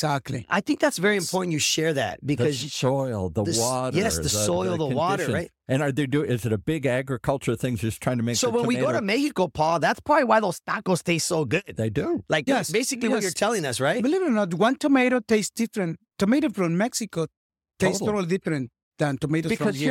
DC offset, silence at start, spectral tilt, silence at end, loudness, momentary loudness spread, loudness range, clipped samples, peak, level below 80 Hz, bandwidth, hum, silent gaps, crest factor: under 0.1%; 0 s; -4.5 dB/octave; 0 s; -24 LUFS; 6 LU; 3 LU; under 0.1%; -6 dBFS; -54 dBFS; 17 kHz; none; 17.37-17.50 s, 18.83-18.91 s; 18 dB